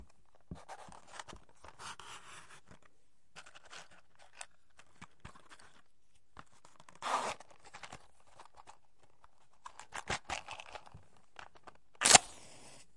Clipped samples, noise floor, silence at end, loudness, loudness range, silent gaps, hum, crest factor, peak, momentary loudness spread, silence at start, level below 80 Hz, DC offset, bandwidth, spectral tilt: under 0.1%; -76 dBFS; 0.65 s; -30 LUFS; 24 LU; none; none; 38 dB; -2 dBFS; 25 LU; 0 s; -66 dBFS; 0.2%; 11.5 kHz; 0 dB/octave